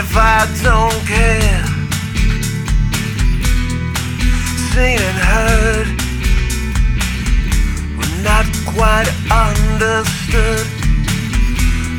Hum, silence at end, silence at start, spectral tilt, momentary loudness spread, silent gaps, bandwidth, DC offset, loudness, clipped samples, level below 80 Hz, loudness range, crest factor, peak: none; 0 s; 0 s; -4.5 dB/octave; 6 LU; none; 17.5 kHz; under 0.1%; -15 LUFS; under 0.1%; -16 dBFS; 2 LU; 14 dB; 0 dBFS